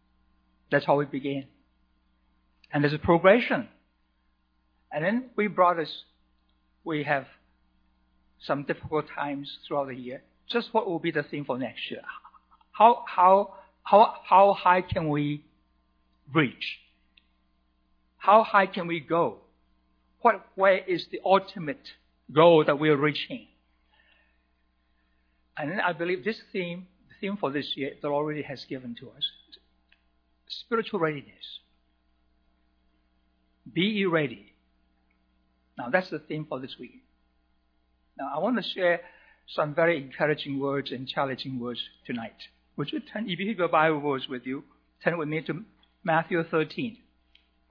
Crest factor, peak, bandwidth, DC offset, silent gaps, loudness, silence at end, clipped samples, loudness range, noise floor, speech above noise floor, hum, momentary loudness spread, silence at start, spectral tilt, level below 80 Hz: 24 dB; -4 dBFS; 5.4 kHz; under 0.1%; none; -26 LUFS; 0.75 s; under 0.1%; 10 LU; -70 dBFS; 44 dB; none; 19 LU; 0.7 s; -8 dB/octave; -62 dBFS